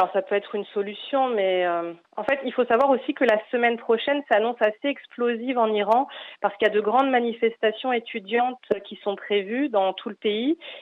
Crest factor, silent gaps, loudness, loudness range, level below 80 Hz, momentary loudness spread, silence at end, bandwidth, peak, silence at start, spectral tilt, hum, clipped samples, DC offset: 16 dB; none; -24 LUFS; 2 LU; -74 dBFS; 9 LU; 0 s; 6.6 kHz; -8 dBFS; 0 s; -6 dB/octave; none; under 0.1%; under 0.1%